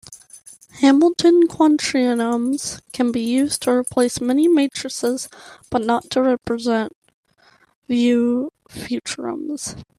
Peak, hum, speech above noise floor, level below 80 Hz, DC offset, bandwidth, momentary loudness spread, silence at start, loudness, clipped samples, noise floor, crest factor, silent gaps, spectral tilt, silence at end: -4 dBFS; none; 38 dB; -56 dBFS; under 0.1%; 14.5 kHz; 13 LU; 0.1 s; -19 LUFS; under 0.1%; -56 dBFS; 16 dB; 6.95-7.02 s, 7.14-7.23 s, 7.75-7.82 s; -4 dB/octave; 0.15 s